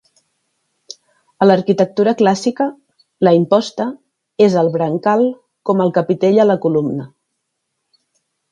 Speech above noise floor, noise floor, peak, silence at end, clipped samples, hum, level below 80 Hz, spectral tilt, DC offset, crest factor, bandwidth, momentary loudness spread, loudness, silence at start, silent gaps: 59 dB; -73 dBFS; 0 dBFS; 1.45 s; under 0.1%; none; -64 dBFS; -7 dB/octave; under 0.1%; 16 dB; 10.5 kHz; 13 LU; -15 LUFS; 1.4 s; none